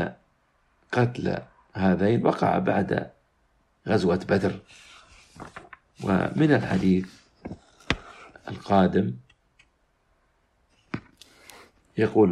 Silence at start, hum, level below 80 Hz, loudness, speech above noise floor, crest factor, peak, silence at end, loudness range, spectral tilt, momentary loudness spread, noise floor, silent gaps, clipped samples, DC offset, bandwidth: 0 s; none; -54 dBFS; -25 LUFS; 44 dB; 24 dB; -2 dBFS; 0 s; 4 LU; -7.5 dB/octave; 21 LU; -67 dBFS; none; under 0.1%; under 0.1%; 10.5 kHz